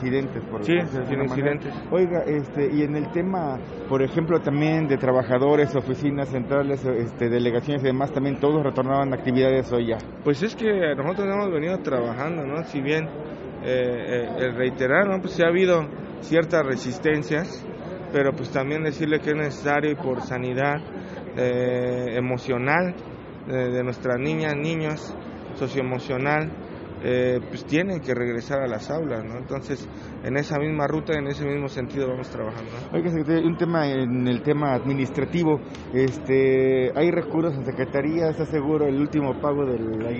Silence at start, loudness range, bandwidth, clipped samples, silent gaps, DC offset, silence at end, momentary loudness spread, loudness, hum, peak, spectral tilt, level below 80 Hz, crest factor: 0 s; 4 LU; 7.6 kHz; under 0.1%; none; under 0.1%; 0 s; 9 LU; -24 LUFS; none; -4 dBFS; -6 dB/octave; -50 dBFS; 18 dB